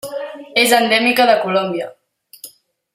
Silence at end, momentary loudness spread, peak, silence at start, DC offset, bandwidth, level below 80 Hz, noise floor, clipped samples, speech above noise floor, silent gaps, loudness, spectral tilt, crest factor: 0.45 s; 15 LU; 0 dBFS; 0.05 s; under 0.1%; 16 kHz; -68 dBFS; -42 dBFS; under 0.1%; 28 dB; none; -14 LUFS; -2.5 dB/octave; 18 dB